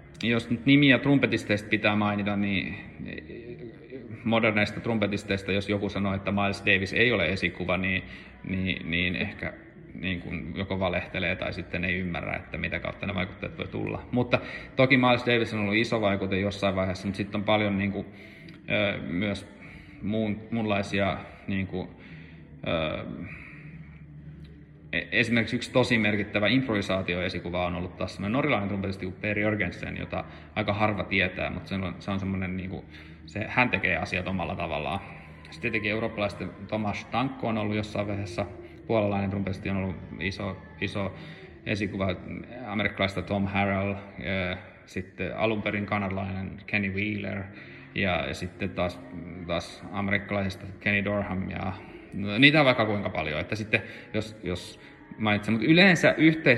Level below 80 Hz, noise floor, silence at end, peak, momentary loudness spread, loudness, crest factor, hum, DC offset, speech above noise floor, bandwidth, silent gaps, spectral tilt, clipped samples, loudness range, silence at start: -54 dBFS; -47 dBFS; 0 s; -2 dBFS; 16 LU; -27 LUFS; 26 dB; none; under 0.1%; 20 dB; 12 kHz; none; -6 dB/octave; under 0.1%; 6 LU; 0 s